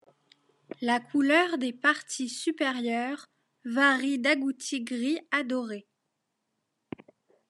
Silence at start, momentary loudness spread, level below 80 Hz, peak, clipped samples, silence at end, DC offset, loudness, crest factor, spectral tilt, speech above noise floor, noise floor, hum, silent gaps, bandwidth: 0.8 s; 19 LU; -88 dBFS; -8 dBFS; under 0.1%; 1.7 s; under 0.1%; -27 LUFS; 22 dB; -2.5 dB/octave; 53 dB; -81 dBFS; none; none; 12 kHz